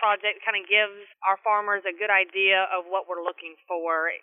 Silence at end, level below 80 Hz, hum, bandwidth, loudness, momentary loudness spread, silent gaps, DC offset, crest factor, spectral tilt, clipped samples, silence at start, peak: 0.05 s; under -90 dBFS; none; 3.9 kHz; -24 LUFS; 11 LU; none; under 0.1%; 18 dB; -5 dB/octave; under 0.1%; 0 s; -6 dBFS